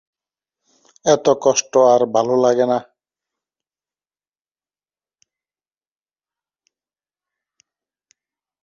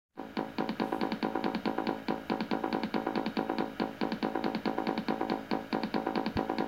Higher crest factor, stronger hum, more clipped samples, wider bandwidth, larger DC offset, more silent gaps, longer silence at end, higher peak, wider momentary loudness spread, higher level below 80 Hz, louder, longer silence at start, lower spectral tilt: about the same, 20 dB vs 18 dB; neither; neither; second, 7.4 kHz vs 16.5 kHz; neither; neither; first, 5.8 s vs 0 s; first, -2 dBFS vs -16 dBFS; first, 6 LU vs 2 LU; second, -68 dBFS vs -60 dBFS; first, -16 LUFS vs -34 LUFS; first, 1.05 s vs 0.15 s; second, -4 dB/octave vs -6.5 dB/octave